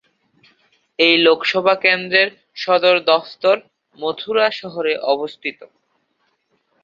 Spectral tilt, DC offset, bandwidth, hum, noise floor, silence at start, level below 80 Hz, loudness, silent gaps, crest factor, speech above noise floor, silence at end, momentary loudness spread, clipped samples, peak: -4.5 dB/octave; under 0.1%; 7.4 kHz; none; -67 dBFS; 1 s; -70 dBFS; -17 LUFS; none; 18 dB; 50 dB; 1.2 s; 13 LU; under 0.1%; -2 dBFS